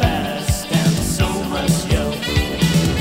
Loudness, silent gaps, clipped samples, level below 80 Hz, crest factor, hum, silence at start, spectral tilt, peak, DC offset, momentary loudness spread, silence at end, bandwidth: -19 LUFS; none; under 0.1%; -28 dBFS; 16 dB; none; 0 s; -5 dB/octave; -2 dBFS; under 0.1%; 4 LU; 0 s; 16.5 kHz